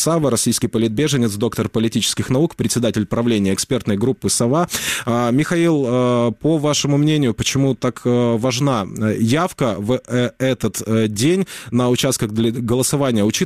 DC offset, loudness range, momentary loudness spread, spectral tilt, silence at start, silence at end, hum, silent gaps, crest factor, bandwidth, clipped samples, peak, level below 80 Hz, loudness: 0.2%; 2 LU; 4 LU; -5 dB/octave; 0 s; 0 s; none; none; 12 dB; 15.5 kHz; under 0.1%; -6 dBFS; -48 dBFS; -18 LUFS